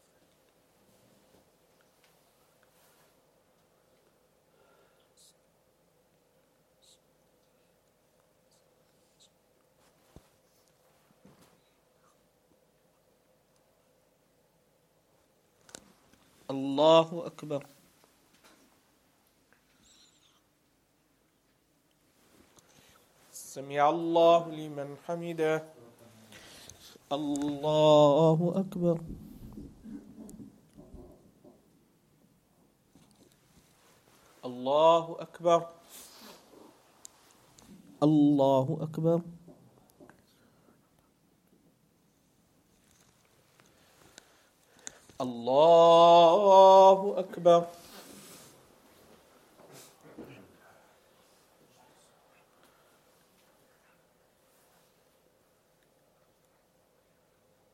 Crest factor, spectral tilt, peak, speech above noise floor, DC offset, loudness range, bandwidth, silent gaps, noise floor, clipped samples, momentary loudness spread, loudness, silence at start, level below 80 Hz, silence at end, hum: 24 dB; -6 dB/octave; -8 dBFS; 46 dB; under 0.1%; 17 LU; 15 kHz; none; -70 dBFS; under 0.1%; 31 LU; -25 LUFS; 16.5 s; -70 dBFS; 7.5 s; none